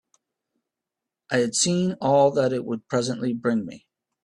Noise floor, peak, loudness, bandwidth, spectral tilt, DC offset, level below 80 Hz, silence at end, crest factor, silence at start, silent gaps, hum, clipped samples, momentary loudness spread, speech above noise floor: -87 dBFS; -8 dBFS; -23 LUFS; 12 kHz; -4.5 dB/octave; under 0.1%; -66 dBFS; 0.45 s; 18 dB; 1.3 s; none; none; under 0.1%; 8 LU; 64 dB